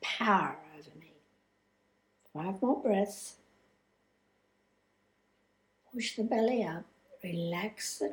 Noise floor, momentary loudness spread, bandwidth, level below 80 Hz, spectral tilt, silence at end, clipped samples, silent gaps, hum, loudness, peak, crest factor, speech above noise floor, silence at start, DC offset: -74 dBFS; 18 LU; 19.5 kHz; -78 dBFS; -4.5 dB/octave; 0 s; under 0.1%; none; 50 Hz at -65 dBFS; -33 LUFS; -14 dBFS; 22 dB; 42 dB; 0 s; under 0.1%